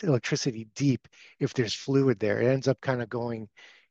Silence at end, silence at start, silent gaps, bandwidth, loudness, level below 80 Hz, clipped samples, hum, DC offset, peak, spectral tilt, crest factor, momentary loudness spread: 0.45 s; 0 s; none; 8 kHz; -28 LUFS; -70 dBFS; under 0.1%; none; under 0.1%; -10 dBFS; -6 dB/octave; 18 dB; 8 LU